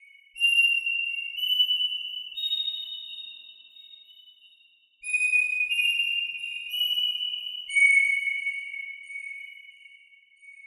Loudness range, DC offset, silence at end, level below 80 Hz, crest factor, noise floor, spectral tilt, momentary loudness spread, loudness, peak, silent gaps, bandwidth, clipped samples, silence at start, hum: 6 LU; under 0.1%; 0 s; -86 dBFS; 18 dB; -61 dBFS; 6 dB/octave; 17 LU; -23 LUFS; -10 dBFS; none; 15.5 kHz; under 0.1%; 0.35 s; none